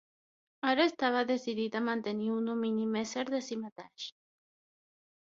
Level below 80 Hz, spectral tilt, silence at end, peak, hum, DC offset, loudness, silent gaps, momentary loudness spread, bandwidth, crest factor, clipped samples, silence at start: -78 dBFS; -2.5 dB/octave; 1.2 s; -12 dBFS; none; under 0.1%; -32 LUFS; 3.72-3.76 s; 15 LU; 7.6 kHz; 22 dB; under 0.1%; 0.65 s